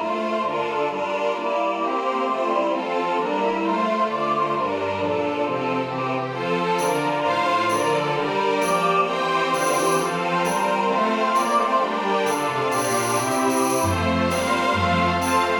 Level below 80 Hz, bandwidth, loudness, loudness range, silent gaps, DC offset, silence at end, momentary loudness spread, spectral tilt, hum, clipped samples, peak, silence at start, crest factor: -54 dBFS; 19 kHz; -22 LUFS; 2 LU; none; under 0.1%; 0 s; 4 LU; -4 dB/octave; none; under 0.1%; -8 dBFS; 0 s; 14 dB